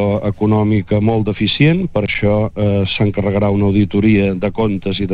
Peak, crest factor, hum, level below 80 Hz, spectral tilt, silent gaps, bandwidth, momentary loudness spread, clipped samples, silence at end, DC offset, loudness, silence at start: -2 dBFS; 12 dB; none; -36 dBFS; -10 dB/octave; none; 5 kHz; 4 LU; under 0.1%; 0 s; under 0.1%; -15 LUFS; 0 s